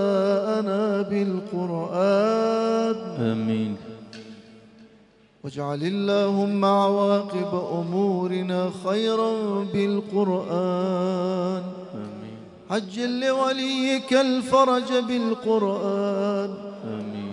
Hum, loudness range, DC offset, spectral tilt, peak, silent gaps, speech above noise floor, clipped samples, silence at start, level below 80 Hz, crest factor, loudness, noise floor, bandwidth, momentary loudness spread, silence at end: none; 5 LU; under 0.1%; -6.5 dB/octave; -6 dBFS; none; 32 dB; under 0.1%; 0 s; -70 dBFS; 18 dB; -24 LUFS; -55 dBFS; 11 kHz; 14 LU; 0 s